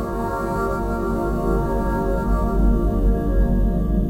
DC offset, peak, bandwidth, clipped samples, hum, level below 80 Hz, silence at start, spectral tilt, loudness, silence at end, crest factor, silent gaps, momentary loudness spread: under 0.1%; -6 dBFS; 16 kHz; under 0.1%; none; -22 dBFS; 0 s; -9 dB/octave; -22 LUFS; 0 s; 12 dB; none; 3 LU